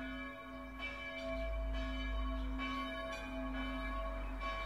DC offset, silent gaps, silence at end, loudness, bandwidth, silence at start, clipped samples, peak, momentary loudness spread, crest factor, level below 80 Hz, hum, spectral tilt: under 0.1%; none; 0 s; -42 LUFS; 11.5 kHz; 0 s; under 0.1%; -28 dBFS; 4 LU; 12 dB; -44 dBFS; none; -6 dB/octave